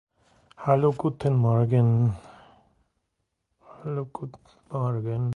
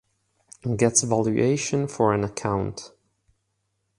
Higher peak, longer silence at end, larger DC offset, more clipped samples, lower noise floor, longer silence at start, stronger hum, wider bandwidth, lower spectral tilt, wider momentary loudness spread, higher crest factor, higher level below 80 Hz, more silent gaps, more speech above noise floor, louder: second, -8 dBFS vs -4 dBFS; second, 0 s vs 1.1 s; neither; neither; first, -79 dBFS vs -75 dBFS; about the same, 0.6 s vs 0.65 s; neither; second, 4.4 kHz vs 11.5 kHz; first, -10.5 dB/octave vs -5 dB/octave; first, 17 LU vs 12 LU; about the same, 20 dB vs 22 dB; about the same, -56 dBFS vs -52 dBFS; neither; about the same, 55 dB vs 52 dB; about the same, -25 LUFS vs -23 LUFS